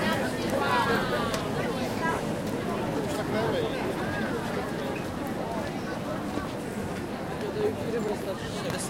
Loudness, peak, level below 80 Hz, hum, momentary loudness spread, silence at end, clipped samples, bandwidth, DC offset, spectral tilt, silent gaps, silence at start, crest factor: -30 LUFS; -14 dBFS; -50 dBFS; none; 7 LU; 0 s; under 0.1%; 16.5 kHz; under 0.1%; -5 dB/octave; none; 0 s; 16 dB